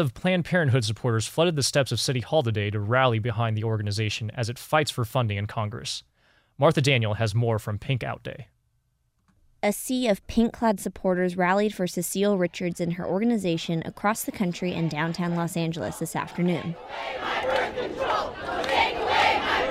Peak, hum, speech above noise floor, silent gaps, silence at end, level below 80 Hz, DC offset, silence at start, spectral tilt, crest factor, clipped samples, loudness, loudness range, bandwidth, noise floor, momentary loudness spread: -8 dBFS; none; 45 dB; none; 0 s; -52 dBFS; under 0.1%; 0 s; -5 dB/octave; 18 dB; under 0.1%; -26 LUFS; 4 LU; 16 kHz; -71 dBFS; 8 LU